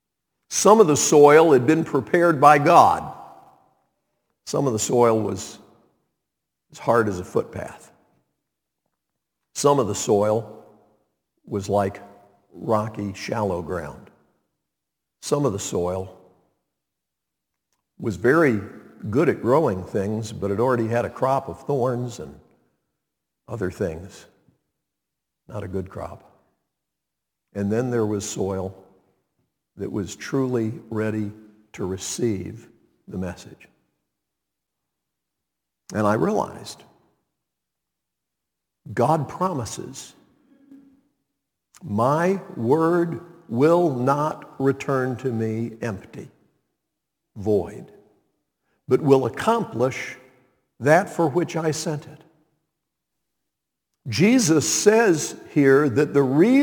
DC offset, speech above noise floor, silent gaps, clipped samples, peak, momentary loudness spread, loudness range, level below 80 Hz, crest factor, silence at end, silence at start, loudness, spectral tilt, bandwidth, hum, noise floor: under 0.1%; 63 dB; none; under 0.1%; 0 dBFS; 19 LU; 12 LU; -60 dBFS; 24 dB; 0 s; 0.5 s; -21 LUFS; -5.5 dB/octave; 19 kHz; none; -84 dBFS